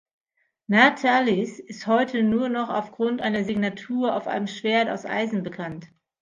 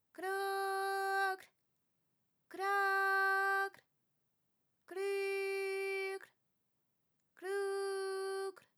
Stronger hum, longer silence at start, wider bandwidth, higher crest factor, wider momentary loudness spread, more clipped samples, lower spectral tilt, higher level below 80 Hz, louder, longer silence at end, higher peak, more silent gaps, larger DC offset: neither; first, 0.7 s vs 0.2 s; second, 7.6 kHz vs 16.5 kHz; first, 24 dB vs 16 dB; first, 14 LU vs 11 LU; neither; first, -5.5 dB/octave vs -1 dB/octave; first, -66 dBFS vs under -90 dBFS; first, -23 LUFS vs -37 LUFS; first, 0.35 s vs 0.2 s; first, 0 dBFS vs -24 dBFS; neither; neither